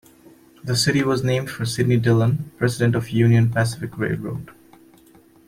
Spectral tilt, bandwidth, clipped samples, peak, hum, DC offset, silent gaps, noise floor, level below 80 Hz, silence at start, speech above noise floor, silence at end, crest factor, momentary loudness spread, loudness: -6 dB/octave; 15.5 kHz; under 0.1%; -4 dBFS; none; under 0.1%; none; -51 dBFS; -54 dBFS; 0.65 s; 32 dB; 0.95 s; 16 dB; 9 LU; -20 LUFS